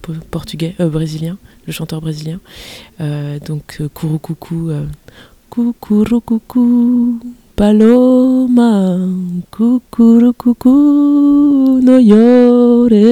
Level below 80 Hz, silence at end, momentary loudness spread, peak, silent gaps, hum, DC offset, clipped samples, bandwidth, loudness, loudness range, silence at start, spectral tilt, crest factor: -40 dBFS; 0 s; 17 LU; 0 dBFS; none; none; under 0.1%; 0.6%; 14 kHz; -11 LUFS; 13 LU; 0.05 s; -8 dB/octave; 12 dB